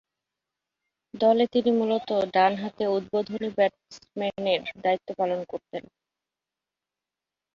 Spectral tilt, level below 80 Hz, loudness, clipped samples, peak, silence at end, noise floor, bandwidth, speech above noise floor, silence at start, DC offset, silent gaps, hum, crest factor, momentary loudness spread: -6 dB/octave; -70 dBFS; -26 LUFS; under 0.1%; -8 dBFS; 1.75 s; -89 dBFS; 7.4 kHz; 64 dB; 1.15 s; under 0.1%; none; none; 20 dB; 11 LU